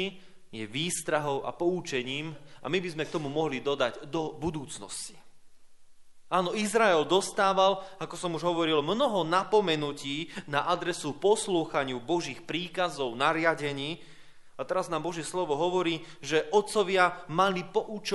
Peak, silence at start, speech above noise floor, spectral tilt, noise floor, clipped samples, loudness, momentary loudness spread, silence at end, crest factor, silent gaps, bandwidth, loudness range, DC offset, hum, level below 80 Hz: -8 dBFS; 0 s; 20 dB; -4 dB/octave; -49 dBFS; under 0.1%; -29 LUFS; 11 LU; 0 s; 20 dB; none; 11.5 kHz; 6 LU; under 0.1%; none; -64 dBFS